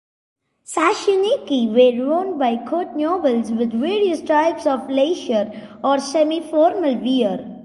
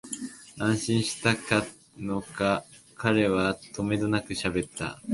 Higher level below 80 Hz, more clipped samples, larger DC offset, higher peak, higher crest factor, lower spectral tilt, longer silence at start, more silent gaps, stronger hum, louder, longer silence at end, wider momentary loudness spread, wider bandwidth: second, -64 dBFS vs -54 dBFS; neither; neither; about the same, -4 dBFS vs -6 dBFS; second, 16 dB vs 22 dB; about the same, -4.5 dB/octave vs -5 dB/octave; first, 0.7 s vs 0.05 s; neither; neither; first, -19 LUFS vs -28 LUFS; about the same, 0 s vs 0 s; second, 6 LU vs 11 LU; about the same, 11.5 kHz vs 11.5 kHz